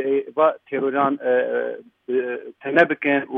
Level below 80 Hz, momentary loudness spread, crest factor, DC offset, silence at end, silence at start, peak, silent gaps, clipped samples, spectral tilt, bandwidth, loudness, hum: -76 dBFS; 12 LU; 18 dB; under 0.1%; 0 s; 0 s; -2 dBFS; none; under 0.1%; -7.5 dB/octave; 6.2 kHz; -21 LUFS; none